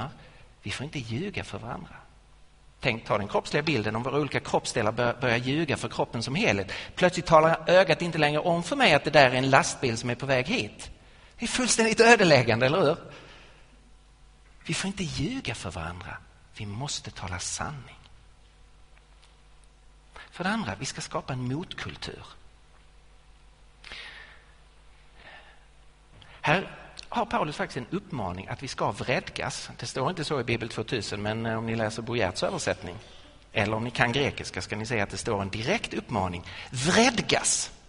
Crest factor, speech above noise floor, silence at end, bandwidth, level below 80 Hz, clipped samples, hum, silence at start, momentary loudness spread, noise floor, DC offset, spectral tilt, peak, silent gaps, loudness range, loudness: 24 dB; 28 dB; 0.1 s; 10.5 kHz; -52 dBFS; under 0.1%; none; 0 s; 18 LU; -55 dBFS; under 0.1%; -4 dB/octave; -4 dBFS; none; 14 LU; -26 LUFS